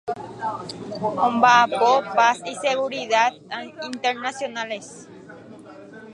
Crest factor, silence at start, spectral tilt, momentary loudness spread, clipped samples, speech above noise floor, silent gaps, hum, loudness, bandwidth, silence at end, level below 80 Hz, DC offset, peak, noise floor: 20 dB; 0.05 s; -3 dB/octave; 18 LU; under 0.1%; 21 dB; none; none; -21 LUFS; 11 kHz; 0 s; -68 dBFS; under 0.1%; -2 dBFS; -42 dBFS